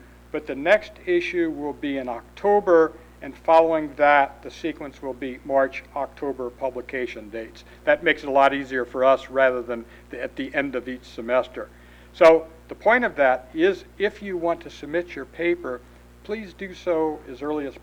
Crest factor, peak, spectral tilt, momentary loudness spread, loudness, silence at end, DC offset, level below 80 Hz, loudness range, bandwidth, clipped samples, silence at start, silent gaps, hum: 18 dB; -4 dBFS; -5.5 dB/octave; 16 LU; -23 LUFS; 0.05 s; under 0.1%; -52 dBFS; 7 LU; 16.5 kHz; under 0.1%; 0.35 s; none; 60 Hz at -50 dBFS